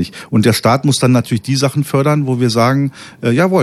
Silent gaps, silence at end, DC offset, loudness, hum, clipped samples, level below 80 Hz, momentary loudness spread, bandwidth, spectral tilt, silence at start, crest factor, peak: none; 0 s; under 0.1%; -14 LUFS; none; under 0.1%; -52 dBFS; 5 LU; 14 kHz; -6 dB/octave; 0 s; 12 dB; 0 dBFS